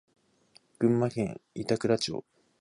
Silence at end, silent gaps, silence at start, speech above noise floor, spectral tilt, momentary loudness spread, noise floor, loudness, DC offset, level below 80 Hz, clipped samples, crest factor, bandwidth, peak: 0.4 s; none; 0.8 s; 35 dB; -6 dB/octave; 10 LU; -63 dBFS; -30 LUFS; under 0.1%; -64 dBFS; under 0.1%; 18 dB; 11.5 kHz; -12 dBFS